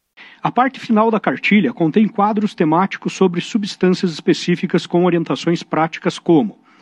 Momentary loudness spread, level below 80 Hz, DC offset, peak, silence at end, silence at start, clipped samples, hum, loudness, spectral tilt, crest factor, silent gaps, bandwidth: 6 LU; -64 dBFS; under 0.1%; -2 dBFS; 0.3 s; 0.2 s; under 0.1%; none; -17 LUFS; -6.5 dB/octave; 14 dB; none; 9.6 kHz